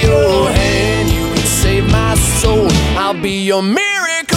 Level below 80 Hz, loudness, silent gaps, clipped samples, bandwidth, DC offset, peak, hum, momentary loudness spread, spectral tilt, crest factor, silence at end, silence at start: -20 dBFS; -13 LUFS; none; under 0.1%; 17 kHz; under 0.1%; 0 dBFS; none; 3 LU; -4.5 dB/octave; 12 dB; 0 s; 0 s